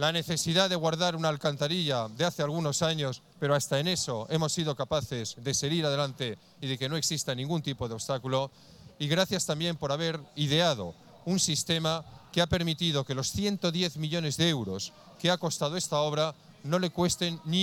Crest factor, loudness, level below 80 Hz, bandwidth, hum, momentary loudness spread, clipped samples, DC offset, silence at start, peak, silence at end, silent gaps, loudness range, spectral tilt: 20 dB; -29 LUFS; -58 dBFS; 17.5 kHz; none; 8 LU; under 0.1%; under 0.1%; 0 s; -8 dBFS; 0 s; none; 2 LU; -4 dB/octave